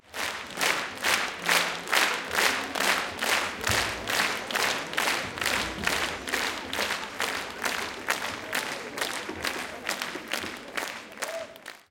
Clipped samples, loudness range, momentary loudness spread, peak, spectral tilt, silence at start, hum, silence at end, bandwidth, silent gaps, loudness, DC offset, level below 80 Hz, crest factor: under 0.1%; 6 LU; 9 LU; -6 dBFS; -1 dB/octave; 0.05 s; none; 0.1 s; 17 kHz; none; -28 LUFS; under 0.1%; -56 dBFS; 24 dB